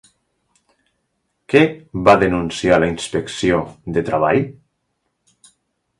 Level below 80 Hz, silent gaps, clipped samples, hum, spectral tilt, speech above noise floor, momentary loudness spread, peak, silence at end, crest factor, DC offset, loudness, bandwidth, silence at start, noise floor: -44 dBFS; none; under 0.1%; none; -5.5 dB/octave; 55 dB; 10 LU; 0 dBFS; 1.5 s; 20 dB; under 0.1%; -17 LUFS; 11.5 kHz; 1.5 s; -71 dBFS